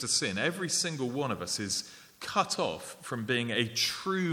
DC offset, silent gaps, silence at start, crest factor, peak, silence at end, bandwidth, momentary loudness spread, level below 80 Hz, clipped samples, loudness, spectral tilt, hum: under 0.1%; none; 0 s; 20 dB; -12 dBFS; 0 s; 19.5 kHz; 9 LU; -70 dBFS; under 0.1%; -31 LUFS; -3 dB/octave; none